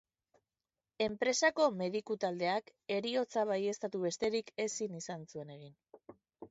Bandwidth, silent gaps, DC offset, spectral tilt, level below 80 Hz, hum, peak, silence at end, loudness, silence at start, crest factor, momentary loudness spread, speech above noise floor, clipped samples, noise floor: 8 kHz; none; under 0.1%; -3 dB/octave; -76 dBFS; none; -18 dBFS; 0.05 s; -35 LUFS; 1 s; 20 dB; 14 LU; over 55 dB; under 0.1%; under -90 dBFS